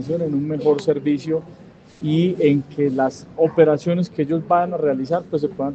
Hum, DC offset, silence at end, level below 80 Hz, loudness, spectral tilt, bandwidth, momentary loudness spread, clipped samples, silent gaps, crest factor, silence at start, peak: none; under 0.1%; 0 s; -60 dBFS; -20 LUFS; -8 dB/octave; 8.2 kHz; 7 LU; under 0.1%; none; 18 dB; 0 s; -2 dBFS